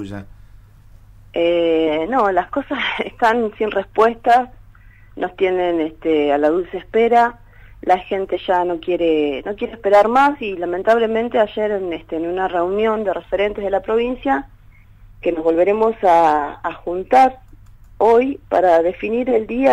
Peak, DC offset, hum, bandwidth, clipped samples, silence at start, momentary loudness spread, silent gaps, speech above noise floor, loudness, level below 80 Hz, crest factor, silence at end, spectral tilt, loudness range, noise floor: -4 dBFS; under 0.1%; none; 10.5 kHz; under 0.1%; 0 s; 10 LU; none; 28 dB; -18 LUFS; -46 dBFS; 14 dB; 0 s; -6 dB/octave; 3 LU; -45 dBFS